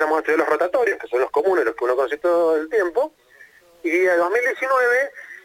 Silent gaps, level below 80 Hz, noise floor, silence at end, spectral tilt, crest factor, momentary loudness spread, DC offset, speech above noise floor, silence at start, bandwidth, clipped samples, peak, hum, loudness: none; -66 dBFS; -50 dBFS; 0.05 s; -3.5 dB/octave; 16 dB; 5 LU; under 0.1%; 30 dB; 0 s; 16 kHz; under 0.1%; -4 dBFS; none; -20 LUFS